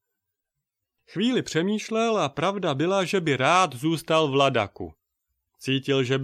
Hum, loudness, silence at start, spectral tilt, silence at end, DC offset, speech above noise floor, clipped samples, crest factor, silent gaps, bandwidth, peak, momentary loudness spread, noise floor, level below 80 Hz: none; -24 LUFS; 1.1 s; -5 dB/octave; 0 s; under 0.1%; 60 dB; under 0.1%; 20 dB; none; 15 kHz; -6 dBFS; 9 LU; -84 dBFS; -64 dBFS